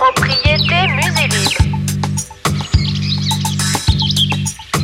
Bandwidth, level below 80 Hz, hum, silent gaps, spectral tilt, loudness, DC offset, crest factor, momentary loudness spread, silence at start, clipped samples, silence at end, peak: 16.5 kHz; -26 dBFS; 50 Hz at -40 dBFS; none; -4 dB/octave; -14 LUFS; under 0.1%; 14 dB; 7 LU; 0 s; under 0.1%; 0 s; 0 dBFS